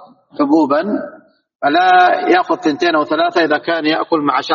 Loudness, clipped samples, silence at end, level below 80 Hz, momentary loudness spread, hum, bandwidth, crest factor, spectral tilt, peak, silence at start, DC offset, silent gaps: -14 LUFS; under 0.1%; 0 s; -64 dBFS; 10 LU; none; 7.2 kHz; 14 dB; -2 dB/octave; 0 dBFS; 0 s; under 0.1%; none